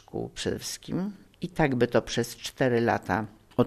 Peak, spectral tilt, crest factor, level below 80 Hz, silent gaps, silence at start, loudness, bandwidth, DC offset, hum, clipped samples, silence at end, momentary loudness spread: -8 dBFS; -5.5 dB/octave; 20 dB; -52 dBFS; none; 0.15 s; -28 LUFS; 13.5 kHz; under 0.1%; none; under 0.1%; 0 s; 11 LU